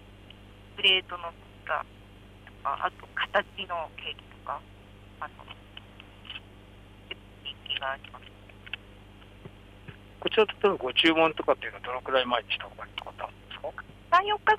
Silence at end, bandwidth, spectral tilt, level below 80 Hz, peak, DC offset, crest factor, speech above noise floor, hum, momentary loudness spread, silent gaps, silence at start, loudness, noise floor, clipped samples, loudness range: 0 s; 13.5 kHz; -4.5 dB/octave; -56 dBFS; -10 dBFS; under 0.1%; 22 dB; 22 dB; 50 Hz at -55 dBFS; 25 LU; none; 0 s; -28 LUFS; -50 dBFS; under 0.1%; 14 LU